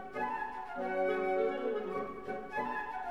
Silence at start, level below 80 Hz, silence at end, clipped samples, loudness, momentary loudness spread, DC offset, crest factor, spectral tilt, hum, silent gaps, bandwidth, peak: 0 s; -64 dBFS; 0 s; under 0.1%; -36 LUFS; 8 LU; 0.2%; 14 dB; -6.5 dB/octave; none; none; 12.5 kHz; -22 dBFS